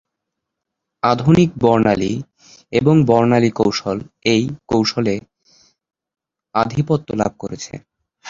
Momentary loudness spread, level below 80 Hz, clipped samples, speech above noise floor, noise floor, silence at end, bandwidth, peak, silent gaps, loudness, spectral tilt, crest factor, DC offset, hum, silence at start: 14 LU; -48 dBFS; under 0.1%; 64 dB; -80 dBFS; 0 s; 7.6 kHz; 0 dBFS; none; -17 LUFS; -6.5 dB/octave; 18 dB; under 0.1%; none; 1.05 s